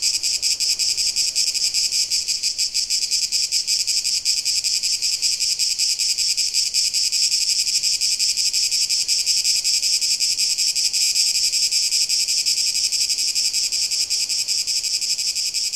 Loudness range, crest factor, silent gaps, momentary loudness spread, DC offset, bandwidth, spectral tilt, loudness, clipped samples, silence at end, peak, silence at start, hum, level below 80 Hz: 2 LU; 18 dB; none; 3 LU; 0.2%; 16.5 kHz; 4 dB/octave; -17 LUFS; under 0.1%; 0 s; -4 dBFS; 0 s; none; -58 dBFS